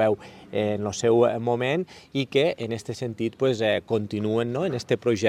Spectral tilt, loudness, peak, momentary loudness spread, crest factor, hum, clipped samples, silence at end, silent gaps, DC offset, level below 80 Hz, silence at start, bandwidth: -5.5 dB/octave; -25 LUFS; -6 dBFS; 10 LU; 18 dB; none; under 0.1%; 0 s; none; under 0.1%; -62 dBFS; 0 s; 12.5 kHz